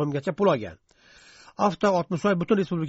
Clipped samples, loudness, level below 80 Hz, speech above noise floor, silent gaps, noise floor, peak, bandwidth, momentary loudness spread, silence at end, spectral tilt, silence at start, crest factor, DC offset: under 0.1%; -24 LUFS; -60 dBFS; 30 dB; none; -54 dBFS; -8 dBFS; 8 kHz; 7 LU; 0 s; -6 dB/octave; 0 s; 18 dB; under 0.1%